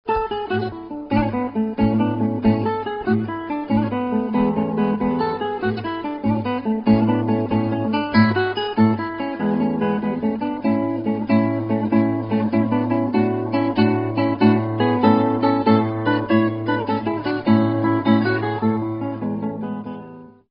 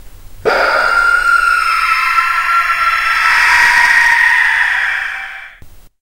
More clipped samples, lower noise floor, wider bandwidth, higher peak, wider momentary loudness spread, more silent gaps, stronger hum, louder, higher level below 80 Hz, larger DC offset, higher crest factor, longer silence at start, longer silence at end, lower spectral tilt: neither; about the same, -40 dBFS vs -37 dBFS; second, 5.4 kHz vs 16.5 kHz; about the same, 0 dBFS vs 0 dBFS; about the same, 8 LU vs 10 LU; neither; neither; second, -20 LUFS vs -10 LUFS; second, -48 dBFS vs -38 dBFS; neither; first, 18 dB vs 12 dB; about the same, 0.05 s vs 0.05 s; about the same, 0.25 s vs 0.2 s; first, -10 dB/octave vs -0.5 dB/octave